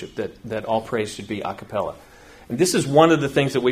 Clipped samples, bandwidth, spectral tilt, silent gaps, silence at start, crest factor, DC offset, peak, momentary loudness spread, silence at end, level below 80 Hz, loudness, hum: under 0.1%; 15.5 kHz; -5 dB/octave; none; 0 s; 22 dB; under 0.1%; 0 dBFS; 15 LU; 0 s; -54 dBFS; -22 LUFS; none